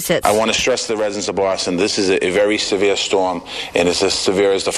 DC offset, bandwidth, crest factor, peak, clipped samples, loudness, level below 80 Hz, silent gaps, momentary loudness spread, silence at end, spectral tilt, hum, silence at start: under 0.1%; 14 kHz; 16 dB; 0 dBFS; under 0.1%; -17 LUFS; -46 dBFS; none; 5 LU; 0 s; -3 dB/octave; none; 0 s